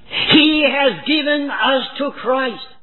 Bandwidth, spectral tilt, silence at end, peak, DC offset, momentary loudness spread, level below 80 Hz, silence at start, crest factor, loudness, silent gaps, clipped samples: 4.3 kHz; -6.5 dB/octave; 0.15 s; 0 dBFS; 0.9%; 11 LU; -52 dBFS; 0.1 s; 16 dB; -15 LUFS; none; under 0.1%